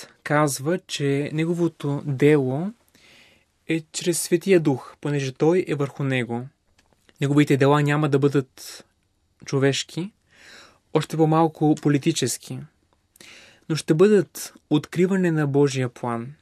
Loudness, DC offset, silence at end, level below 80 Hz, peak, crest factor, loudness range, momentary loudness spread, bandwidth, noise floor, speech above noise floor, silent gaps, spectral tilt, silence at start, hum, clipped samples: -22 LUFS; under 0.1%; 0.1 s; -68 dBFS; -4 dBFS; 18 dB; 2 LU; 13 LU; 14.5 kHz; -67 dBFS; 46 dB; none; -6 dB/octave; 0 s; none; under 0.1%